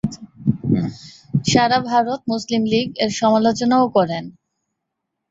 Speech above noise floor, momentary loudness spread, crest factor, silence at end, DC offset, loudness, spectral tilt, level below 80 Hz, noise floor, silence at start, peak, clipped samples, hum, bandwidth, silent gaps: 61 dB; 11 LU; 18 dB; 1 s; under 0.1%; -19 LUFS; -5.5 dB/octave; -50 dBFS; -78 dBFS; 0.05 s; -2 dBFS; under 0.1%; none; 8 kHz; none